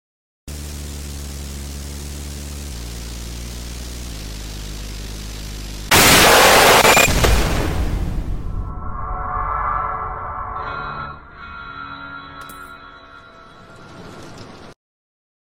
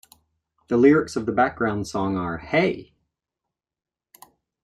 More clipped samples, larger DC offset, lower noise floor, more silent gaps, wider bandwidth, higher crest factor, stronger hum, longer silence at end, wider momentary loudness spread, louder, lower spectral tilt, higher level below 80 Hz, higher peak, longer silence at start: neither; neither; second, -42 dBFS vs -85 dBFS; neither; first, 17 kHz vs 15 kHz; about the same, 20 dB vs 20 dB; neither; second, 0.75 s vs 1.8 s; first, 26 LU vs 9 LU; first, -15 LUFS vs -22 LUFS; second, -2.5 dB/octave vs -6.5 dB/octave; first, -28 dBFS vs -54 dBFS; first, 0 dBFS vs -4 dBFS; second, 0.45 s vs 0.7 s